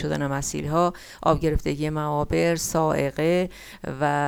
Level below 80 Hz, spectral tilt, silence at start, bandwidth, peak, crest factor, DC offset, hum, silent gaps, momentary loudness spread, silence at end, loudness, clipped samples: -40 dBFS; -5.5 dB/octave; 0 s; 18.5 kHz; -6 dBFS; 18 dB; under 0.1%; none; none; 4 LU; 0 s; -24 LUFS; under 0.1%